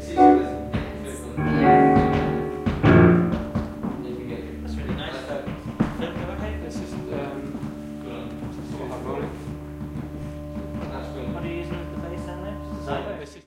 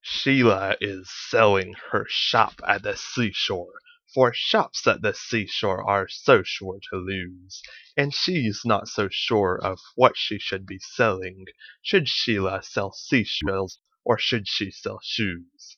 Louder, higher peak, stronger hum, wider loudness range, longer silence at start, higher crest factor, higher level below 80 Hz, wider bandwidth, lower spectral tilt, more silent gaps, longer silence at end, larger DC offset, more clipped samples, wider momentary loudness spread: about the same, -24 LUFS vs -23 LUFS; about the same, -2 dBFS vs 0 dBFS; neither; first, 13 LU vs 3 LU; about the same, 0 s vs 0.05 s; about the same, 22 dB vs 24 dB; first, -38 dBFS vs -56 dBFS; first, 15 kHz vs 7.2 kHz; first, -8 dB/octave vs -4.5 dB/octave; neither; about the same, 0.05 s vs 0.05 s; neither; neither; first, 18 LU vs 13 LU